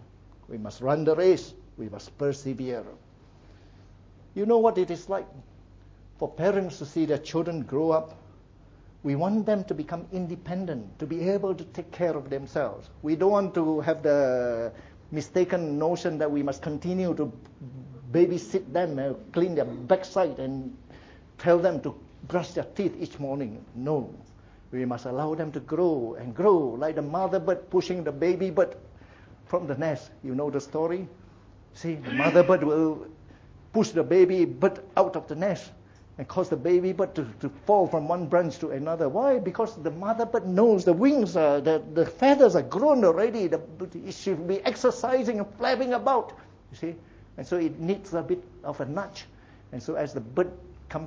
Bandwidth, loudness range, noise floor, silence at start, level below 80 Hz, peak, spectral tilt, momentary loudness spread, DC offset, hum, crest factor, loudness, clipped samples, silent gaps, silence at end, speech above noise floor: 7.8 kHz; 8 LU; -53 dBFS; 0 s; -58 dBFS; -6 dBFS; -7 dB/octave; 15 LU; under 0.1%; none; 20 dB; -26 LUFS; under 0.1%; none; 0 s; 27 dB